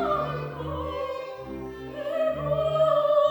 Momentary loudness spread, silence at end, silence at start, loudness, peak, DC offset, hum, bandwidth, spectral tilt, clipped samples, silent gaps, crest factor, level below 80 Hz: 15 LU; 0 s; 0 s; -27 LUFS; -10 dBFS; under 0.1%; none; over 20 kHz; -7 dB/octave; under 0.1%; none; 16 dB; -50 dBFS